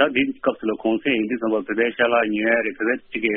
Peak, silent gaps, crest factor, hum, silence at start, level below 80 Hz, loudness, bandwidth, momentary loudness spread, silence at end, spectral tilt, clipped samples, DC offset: -2 dBFS; none; 18 dB; none; 0 s; -60 dBFS; -21 LUFS; 3.8 kHz; 5 LU; 0 s; -2.5 dB/octave; under 0.1%; under 0.1%